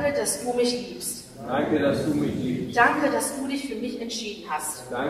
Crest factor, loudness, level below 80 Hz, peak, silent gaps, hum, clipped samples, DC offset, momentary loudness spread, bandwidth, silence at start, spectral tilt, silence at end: 20 dB; -26 LUFS; -56 dBFS; -6 dBFS; none; none; under 0.1%; under 0.1%; 11 LU; 15.5 kHz; 0 s; -4 dB/octave; 0 s